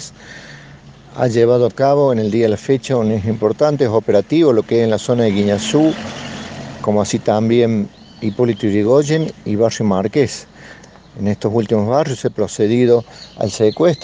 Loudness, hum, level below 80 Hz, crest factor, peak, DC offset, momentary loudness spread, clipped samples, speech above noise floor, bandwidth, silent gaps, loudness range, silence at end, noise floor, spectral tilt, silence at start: -16 LUFS; none; -52 dBFS; 16 dB; 0 dBFS; under 0.1%; 12 LU; under 0.1%; 25 dB; 9.8 kHz; none; 3 LU; 0 s; -40 dBFS; -6.5 dB/octave; 0 s